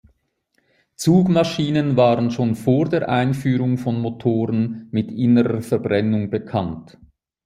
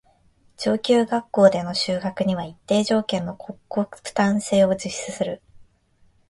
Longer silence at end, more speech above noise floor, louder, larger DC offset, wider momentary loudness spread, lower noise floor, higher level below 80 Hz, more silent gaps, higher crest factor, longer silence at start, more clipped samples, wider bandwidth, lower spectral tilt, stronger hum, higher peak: about the same, 0.6 s vs 0.7 s; first, 49 dB vs 38 dB; first, -19 LUFS vs -22 LUFS; neither; second, 7 LU vs 12 LU; first, -68 dBFS vs -59 dBFS; about the same, -56 dBFS vs -58 dBFS; neither; about the same, 16 dB vs 20 dB; first, 1 s vs 0.6 s; neither; first, 15.5 kHz vs 11.5 kHz; first, -7.5 dB/octave vs -5 dB/octave; neither; about the same, -4 dBFS vs -2 dBFS